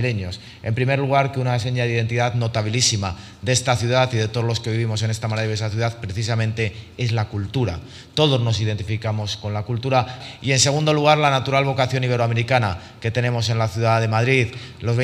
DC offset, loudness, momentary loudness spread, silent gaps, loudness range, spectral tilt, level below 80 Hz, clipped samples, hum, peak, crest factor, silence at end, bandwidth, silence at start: under 0.1%; -21 LUFS; 9 LU; none; 4 LU; -4.5 dB/octave; -50 dBFS; under 0.1%; none; 0 dBFS; 20 dB; 0 s; 12.5 kHz; 0 s